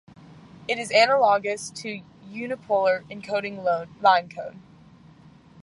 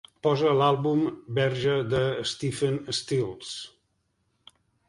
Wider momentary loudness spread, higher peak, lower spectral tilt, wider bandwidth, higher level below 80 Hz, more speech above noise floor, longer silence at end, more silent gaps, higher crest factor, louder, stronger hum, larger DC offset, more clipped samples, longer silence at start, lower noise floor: first, 19 LU vs 12 LU; first, -4 dBFS vs -8 dBFS; second, -3 dB/octave vs -5.5 dB/octave; about the same, 11.5 kHz vs 11.5 kHz; second, -66 dBFS vs -58 dBFS; second, 27 dB vs 48 dB; second, 1.05 s vs 1.2 s; neither; about the same, 20 dB vs 18 dB; first, -23 LUFS vs -26 LUFS; neither; neither; neither; about the same, 0.3 s vs 0.25 s; second, -51 dBFS vs -73 dBFS